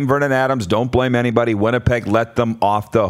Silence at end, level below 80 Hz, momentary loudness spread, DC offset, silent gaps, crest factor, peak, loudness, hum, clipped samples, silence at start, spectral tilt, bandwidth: 0 s; -40 dBFS; 2 LU; under 0.1%; none; 16 dB; 0 dBFS; -17 LUFS; none; under 0.1%; 0 s; -7 dB/octave; 14.5 kHz